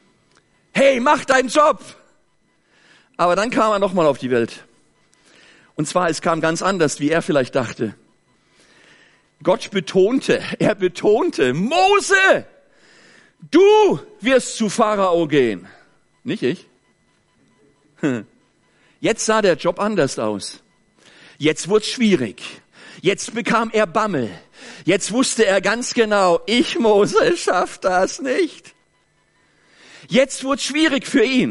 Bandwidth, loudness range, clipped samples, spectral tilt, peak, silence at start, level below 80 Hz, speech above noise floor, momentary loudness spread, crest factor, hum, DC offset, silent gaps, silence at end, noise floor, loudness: 11.5 kHz; 5 LU; under 0.1%; -4 dB/octave; -4 dBFS; 0.75 s; -54 dBFS; 45 dB; 10 LU; 16 dB; none; under 0.1%; none; 0 s; -63 dBFS; -18 LUFS